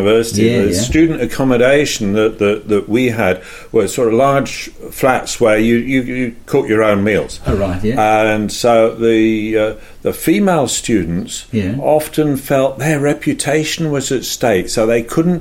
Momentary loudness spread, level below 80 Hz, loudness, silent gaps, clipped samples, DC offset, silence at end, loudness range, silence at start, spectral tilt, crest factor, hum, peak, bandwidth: 6 LU; -34 dBFS; -14 LUFS; none; under 0.1%; under 0.1%; 0 s; 2 LU; 0 s; -5 dB/octave; 12 dB; none; 0 dBFS; 16.5 kHz